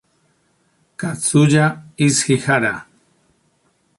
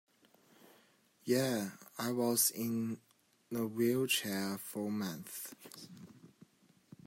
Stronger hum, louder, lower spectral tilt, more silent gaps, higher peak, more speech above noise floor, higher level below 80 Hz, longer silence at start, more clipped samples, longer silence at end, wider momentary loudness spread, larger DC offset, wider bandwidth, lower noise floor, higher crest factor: neither; first, -17 LUFS vs -35 LUFS; about the same, -4.5 dB/octave vs -3.5 dB/octave; neither; first, -2 dBFS vs -18 dBFS; first, 47 dB vs 33 dB; first, -56 dBFS vs -82 dBFS; second, 1 s vs 1.25 s; neither; first, 1.15 s vs 0.8 s; second, 13 LU vs 19 LU; neither; second, 11.5 kHz vs 16 kHz; second, -62 dBFS vs -68 dBFS; about the same, 18 dB vs 22 dB